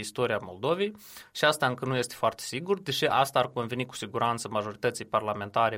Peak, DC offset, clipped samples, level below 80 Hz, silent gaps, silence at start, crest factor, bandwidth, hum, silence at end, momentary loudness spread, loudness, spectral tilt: -8 dBFS; under 0.1%; under 0.1%; -68 dBFS; none; 0 s; 22 dB; 16.5 kHz; none; 0 s; 8 LU; -29 LUFS; -4 dB/octave